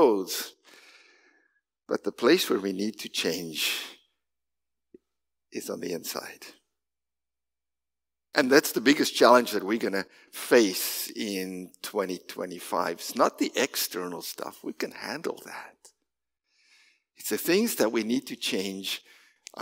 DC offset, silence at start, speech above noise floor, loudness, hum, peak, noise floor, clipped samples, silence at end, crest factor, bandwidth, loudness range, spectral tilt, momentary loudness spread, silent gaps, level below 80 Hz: under 0.1%; 0 s; over 63 dB; -27 LUFS; none; -2 dBFS; under -90 dBFS; under 0.1%; 0 s; 26 dB; 16.5 kHz; 15 LU; -3 dB/octave; 16 LU; none; -82 dBFS